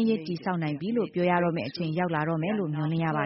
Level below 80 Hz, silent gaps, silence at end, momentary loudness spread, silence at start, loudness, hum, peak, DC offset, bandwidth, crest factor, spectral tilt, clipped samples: -66 dBFS; none; 0 s; 5 LU; 0 s; -28 LUFS; none; -12 dBFS; under 0.1%; 5.8 kHz; 16 dB; -6 dB/octave; under 0.1%